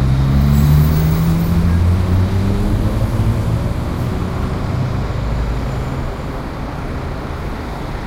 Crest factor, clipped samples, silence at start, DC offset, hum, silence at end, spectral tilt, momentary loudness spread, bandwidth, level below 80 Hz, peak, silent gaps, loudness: 14 dB; under 0.1%; 0 s; under 0.1%; none; 0 s; -7.5 dB/octave; 12 LU; 16 kHz; -22 dBFS; -2 dBFS; none; -17 LUFS